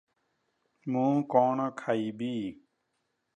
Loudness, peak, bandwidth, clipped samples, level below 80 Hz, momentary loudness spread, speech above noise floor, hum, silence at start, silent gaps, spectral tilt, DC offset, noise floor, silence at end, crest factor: -29 LUFS; -10 dBFS; 9.2 kHz; under 0.1%; -76 dBFS; 11 LU; 51 dB; none; 0.85 s; none; -8 dB/octave; under 0.1%; -79 dBFS; 0.85 s; 22 dB